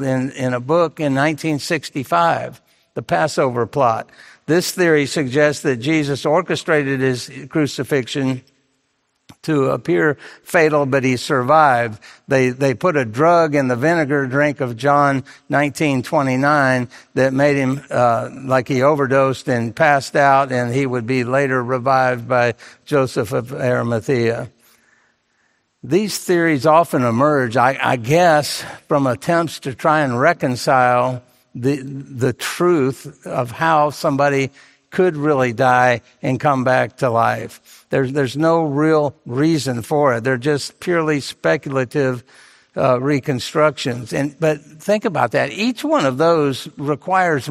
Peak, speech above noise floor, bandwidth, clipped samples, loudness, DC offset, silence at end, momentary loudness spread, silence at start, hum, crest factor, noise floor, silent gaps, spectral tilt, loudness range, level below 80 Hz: 0 dBFS; 50 dB; 16 kHz; under 0.1%; -17 LUFS; under 0.1%; 0 s; 8 LU; 0 s; none; 18 dB; -67 dBFS; none; -6 dB/octave; 4 LU; -58 dBFS